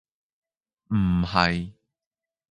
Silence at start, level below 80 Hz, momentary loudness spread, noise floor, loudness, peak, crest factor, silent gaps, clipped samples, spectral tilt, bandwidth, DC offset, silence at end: 0.9 s; -42 dBFS; 10 LU; under -90 dBFS; -24 LUFS; -4 dBFS; 24 dB; none; under 0.1%; -7 dB/octave; 9.6 kHz; under 0.1%; 0.8 s